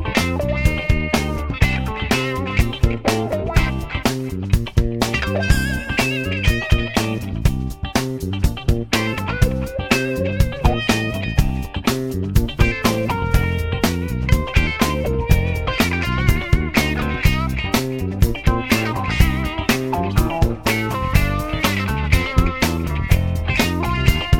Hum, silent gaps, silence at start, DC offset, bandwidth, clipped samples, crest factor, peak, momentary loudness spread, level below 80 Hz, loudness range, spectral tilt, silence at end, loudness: none; none; 0 s; under 0.1%; 17.5 kHz; under 0.1%; 18 dB; 0 dBFS; 4 LU; -24 dBFS; 2 LU; -5.5 dB/octave; 0 s; -20 LUFS